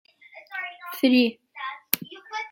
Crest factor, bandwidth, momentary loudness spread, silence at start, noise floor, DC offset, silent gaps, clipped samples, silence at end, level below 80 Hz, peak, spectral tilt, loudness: 26 dB; 17 kHz; 16 LU; 0.35 s; -46 dBFS; under 0.1%; none; under 0.1%; 0.05 s; -82 dBFS; 0 dBFS; -3 dB/octave; -26 LUFS